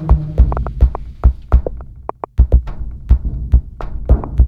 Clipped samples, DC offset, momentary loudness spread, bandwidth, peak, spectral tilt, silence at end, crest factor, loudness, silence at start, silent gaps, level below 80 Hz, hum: 0.1%; under 0.1%; 14 LU; 2.6 kHz; 0 dBFS; -11 dB/octave; 0 s; 14 dB; -17 LUFS; 0 s; none; -14 dBFS; none